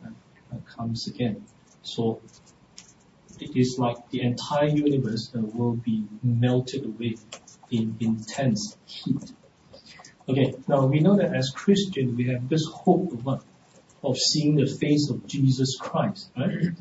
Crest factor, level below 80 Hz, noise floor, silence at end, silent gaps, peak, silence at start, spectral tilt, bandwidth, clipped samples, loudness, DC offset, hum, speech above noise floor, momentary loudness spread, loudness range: 20 dB; -60 dBFS; -56 dBFS; 0.05 s; none; -6 dBFS; 0 s; -6 dB/octave; 8 kHz; under 0.1%; -25 LUFS; under 0.1%; none; 31 dB; 14 LU; 7 LU